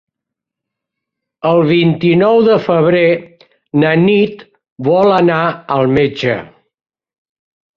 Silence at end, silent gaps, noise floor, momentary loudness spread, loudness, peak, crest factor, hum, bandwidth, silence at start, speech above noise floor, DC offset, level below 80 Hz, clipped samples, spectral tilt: 1.3 s; 4.71-4.76 s; -81 dBFS; 9 LU; -12 LUFS; 0 dBFS; 14 dB; none; 7 kHz; 1.45 s; 70 dB; under 0.1%; -52 dBFS; under 0.1%; -8.5 dB/octave